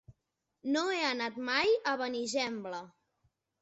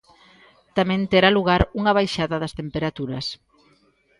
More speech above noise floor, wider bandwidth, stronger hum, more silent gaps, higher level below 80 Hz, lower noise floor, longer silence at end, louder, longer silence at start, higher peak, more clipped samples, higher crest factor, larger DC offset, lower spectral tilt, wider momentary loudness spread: first, 52 dB vs 40 dB; second, 8 kHz vs 11.5 kHz; neither; neither; second, -74 dBFS vs -40 dBFS; first, -84 dBFS vs -61 dBFS; about the same, 0.75 s vs 0.85 s; second, -32 LUFS vs -21 LUFS; second, 0.1 s vs 0.75 s; second, -16 dBFS vs 0 dBFS; neither; about the same, 18 dB vs 22 dB; neither; second, -0.5 dB/octave vs -6 dB/octave; about the same, 13 LU vs 12 LU